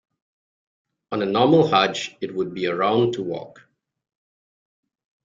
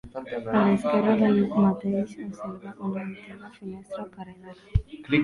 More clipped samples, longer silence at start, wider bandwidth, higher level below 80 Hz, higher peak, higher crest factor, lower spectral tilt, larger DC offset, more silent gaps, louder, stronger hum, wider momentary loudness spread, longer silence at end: neither; first, 1.1 s vs 0.05 s; second, 7.6 kHz vs 10.5 kHz; second, -64 dBFS vs -42 dBFS; first, -4 dBFS vs -8 dBFS; about the same, 20 dB vs 18 dB; second, -5.5 dB/octave vs -8.5 dB/octave; neither; neither; first, -21 LUFS vs -25 LUFS; neither; second, 13 LU vs 20 LU; first, 1.75 s vs 0 s